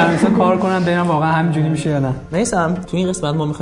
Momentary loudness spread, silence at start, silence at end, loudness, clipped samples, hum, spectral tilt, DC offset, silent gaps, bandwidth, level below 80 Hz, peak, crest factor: 6 LU; 0 s; 0 s; -17 LUFS; under 0.1%; none; -6 dB/octave; under 0.1%; none; 11 kHz; -44 dBFS; -2 dBFS; 14 dB